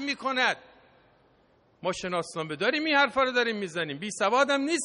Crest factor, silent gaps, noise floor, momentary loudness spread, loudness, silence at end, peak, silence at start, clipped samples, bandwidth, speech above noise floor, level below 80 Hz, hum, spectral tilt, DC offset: 18 dB; none; -64 dBFS; 10 LU; -27 LUFS; 0 s; -10 dBFS; 0 s; under 0.1%; 10.5 kHz; 37 dB; -68 dBFS; none; -3 dB/octave; under 0.1%